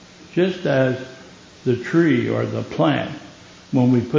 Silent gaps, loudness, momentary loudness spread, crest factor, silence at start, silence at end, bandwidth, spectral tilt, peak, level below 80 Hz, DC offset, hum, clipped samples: none; -20 LUFS; 12 LU; 16 dB; 0.2 s; 0 s; 7.6 kHz; -7.5 dB/octave; -4 dBFS; -56 dBFS; under 0.1%; none; under 0.1%